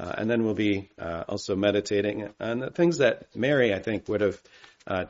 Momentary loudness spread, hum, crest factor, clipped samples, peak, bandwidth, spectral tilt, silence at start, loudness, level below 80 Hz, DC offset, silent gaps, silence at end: 10 LU; none; 18 dB; under 0.1%; -8 dBFS; 7.6 kHz; -5 dB/octave; 0 s; -26 LUFS; -62 dBFS; under 0.1%; none; 0 s